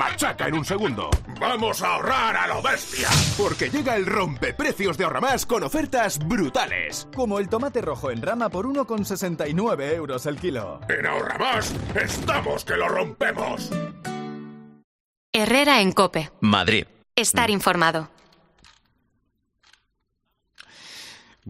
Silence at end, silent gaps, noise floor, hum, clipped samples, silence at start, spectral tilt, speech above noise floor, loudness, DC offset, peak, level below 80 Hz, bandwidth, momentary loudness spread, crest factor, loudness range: 0 s; 14.84-15.33 s; -74 dBFS; none; under 0.1%; 0 s; -4 dB/octave; 51 dB; -23 LUFS; under 0.1%; -2 dBFS; -44 dBFS; 15 kHz; 10 LU; 22 dB; 5 LU